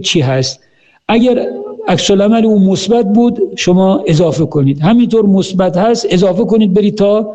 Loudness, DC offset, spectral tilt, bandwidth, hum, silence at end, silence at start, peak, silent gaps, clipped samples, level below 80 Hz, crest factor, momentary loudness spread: -11 LUFS; under 0.1%; -6 dB/octave; 8.6 kHz; none; 0 s; 0 s; -2 dBFS; none; under 0.1%; -42 dBFS; 8 dB; 6 LU